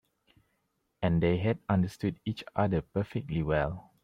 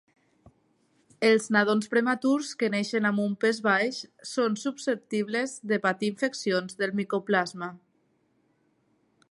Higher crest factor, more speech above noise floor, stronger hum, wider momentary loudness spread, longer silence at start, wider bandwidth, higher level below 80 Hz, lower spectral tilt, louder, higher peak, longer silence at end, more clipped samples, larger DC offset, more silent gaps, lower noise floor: about the same, 18 dB vs 20 dB; first, 48 dB vs 43 dB; neither; about the same, 7 LU vs 7 LU; second, 1 s vs 1.2 s; about the same, 11.5 kHz vs 11.5 kHz; first, -50 dBFS vs -76 dBFS; first, -8.5 dB/octave vs -4.5 dB/octave; second, -31 LUFS vs -27 LUFS; second, -14 dBFS vs -8 dBFS; second, 0.25 s vs 1.55 s; neither; neither; neither; first, -78 dBFS vs -70 dBFS